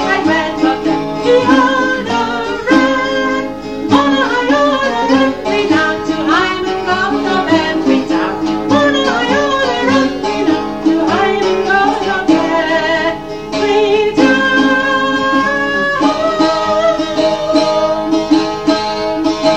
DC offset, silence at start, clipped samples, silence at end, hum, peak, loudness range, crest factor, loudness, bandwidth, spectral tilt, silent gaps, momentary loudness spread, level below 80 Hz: 0.8%; 0 s; under 0.1%; 0 s; none; 0 dBFS; 1 LU; 12 dB; -13 LUFS; 9.4 kHz; -4.5 dB/octave; none; 5 LU; -42 dBFS